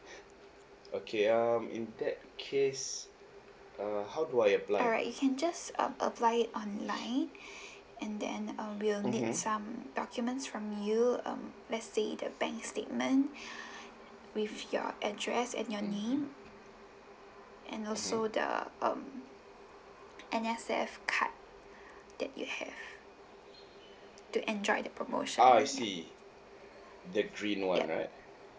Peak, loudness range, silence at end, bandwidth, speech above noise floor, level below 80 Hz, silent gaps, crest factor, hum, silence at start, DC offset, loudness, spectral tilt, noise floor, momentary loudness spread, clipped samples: -12 dBFS; 6 LU; 0 s; 8 kHz; 23 dB; -72 dBFS; none; 24 dB; none; 0 s; under 0.1%; -34 LUFS; -3.5 dB/octave; -56 dBFS; 23 LU; under 0.1%